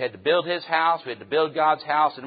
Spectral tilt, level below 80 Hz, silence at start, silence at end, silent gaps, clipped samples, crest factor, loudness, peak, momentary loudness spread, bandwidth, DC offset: -8.5 dB/octave; -70 dBFS; 0 s; 0 s; none; under 0.1%; 16 dB; -23 LUFS; -6 dBFS; 4 LU; 5 kHz; under 0.1%